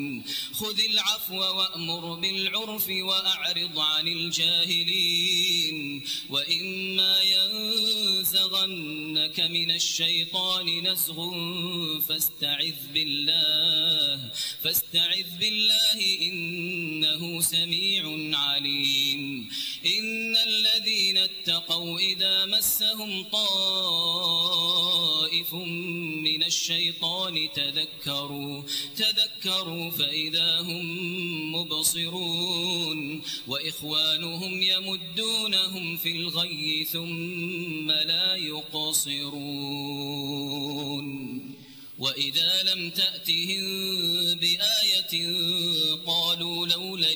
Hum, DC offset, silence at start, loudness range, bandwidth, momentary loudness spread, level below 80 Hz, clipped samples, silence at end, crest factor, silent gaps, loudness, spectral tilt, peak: none; under 0.1%; 0 s; 4 LU; over 20 kHz; 9 LU; -70 dBFS; under 0.1%; 0 s; 18 dB; none; -24 LUFS; -1.5 dB/octave; -10 dBFS